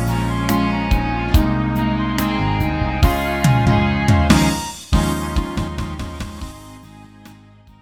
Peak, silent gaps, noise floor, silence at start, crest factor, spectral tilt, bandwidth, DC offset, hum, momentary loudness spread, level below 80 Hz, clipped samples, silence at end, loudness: 0 dBFS; none; -45 dBFS; 0 s; 18 dB; -6 dB/octave; 19.5 kHz; under 0.1%; none; 13 LU; -24 dBFS; under 0.1%; 0.5 s; -18 LUFS